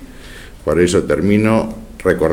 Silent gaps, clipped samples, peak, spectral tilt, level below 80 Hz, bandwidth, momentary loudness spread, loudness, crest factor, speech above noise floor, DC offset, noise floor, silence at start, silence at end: none; under 0.1%; 0 dBFS; -6 dB/octave; -36 dBFS; 16.5 kHz; 22 LU; -16 LUFS; 16 dB; 21 dB; under 0.1%; -35 dBFS; 0 s; 0 s